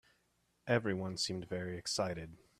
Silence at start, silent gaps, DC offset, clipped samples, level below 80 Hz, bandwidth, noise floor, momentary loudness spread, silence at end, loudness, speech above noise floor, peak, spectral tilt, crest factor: 0.65 s; none; under 0.1%; under 0.1%; -68 dBFS; 14.5 kHz; -77 dBFS; 8 LU; 0.25 s; -37 LUFS; 39 dB; -18 dBFS; -4 dB/octave; 22 dB